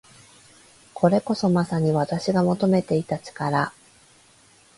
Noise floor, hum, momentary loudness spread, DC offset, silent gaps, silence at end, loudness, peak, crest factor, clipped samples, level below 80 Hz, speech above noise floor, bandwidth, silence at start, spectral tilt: -55 dBFS; none; 7 LU; under 0.1%; none; 1.1 s; -23 LUFS; -4 dBFS; 20 dB; under 0.1%; -60 dBFS; 34 dB; 11.5 kHz; 0.95 s; -7 dB/octave